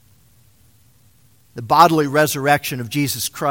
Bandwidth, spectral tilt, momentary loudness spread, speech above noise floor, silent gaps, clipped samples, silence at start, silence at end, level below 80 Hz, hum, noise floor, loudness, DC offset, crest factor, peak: 17 kHz; -4 dB/octave; 12 LU; 38 dB; none; under 0.1%; 1.55 s; 0 s; -56 dBFS; none; -55 dBFS; -17 LUFS; 0.1%; 20 dB; 0 dBFS